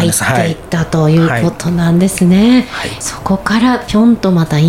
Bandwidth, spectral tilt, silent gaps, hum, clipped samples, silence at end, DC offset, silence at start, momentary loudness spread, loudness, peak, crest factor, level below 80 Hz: 16 kHz; -5.5 dB/octave; none; none; under 0.1%; 0 s; under 0.1%; 0 s; 8 LU; -12 LUFS; 0 dBFS; 10 dB; -36 dBFS